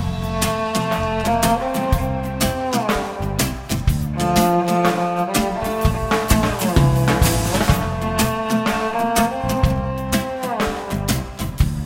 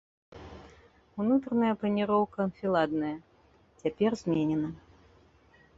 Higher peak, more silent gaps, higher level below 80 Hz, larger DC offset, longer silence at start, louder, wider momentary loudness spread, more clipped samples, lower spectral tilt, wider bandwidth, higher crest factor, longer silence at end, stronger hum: first, -2 dBFS vs -14 dBFS; neither; first, -28 dBFS vs -62 dBFS; neither; second, 0 s vs 0.3 s; first, -20 LUFS vs -29 LUFS; second, 6 LU vs 21 LU; neither; second, -5 dB/octave vs -7.5 dB/octave; first, 17 kHz vs 7.8 kHz; about the same, 18 dB vs 18 dB; second, 0 s vs 1 s; neither